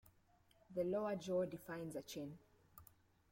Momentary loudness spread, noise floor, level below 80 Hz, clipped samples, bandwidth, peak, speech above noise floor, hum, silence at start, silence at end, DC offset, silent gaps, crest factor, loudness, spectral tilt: 22 LU; -74 dBFS; -78 dBFS; under 0.1%; 16.5 kHz; -30 dBFS; 30 dB; none; 0.7 s; 0.45 s; under 0.1%; none; 16 dB; -44 LUFS; -6 dB/octave